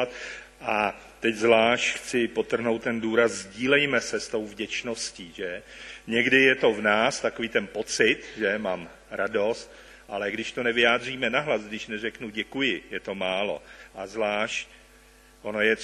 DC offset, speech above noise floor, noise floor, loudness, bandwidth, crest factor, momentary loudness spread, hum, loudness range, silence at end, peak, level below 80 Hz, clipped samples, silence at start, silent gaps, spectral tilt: under 0.1%; 28 dB; -54 dBFS; -25 LUFS; 12.5 kHz; 22 dB; 15 LU; none; 6 LU; 0 s; -4 dBFS; -58 dBFS; under 0.1%; 0 s; none; -3 dB/octave